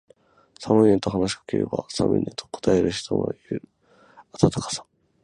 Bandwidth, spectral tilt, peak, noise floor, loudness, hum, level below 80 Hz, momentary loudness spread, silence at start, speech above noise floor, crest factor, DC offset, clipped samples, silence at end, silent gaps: 11 kHz; -6 dB/octave; -2 dBFS; -56 dBFS; -24 LUFS; none; -48 dBFS; 14 LU; 0.6 s; 33 dB; 22 dB; under 0.1%; under 0.1%; 0.4 s; none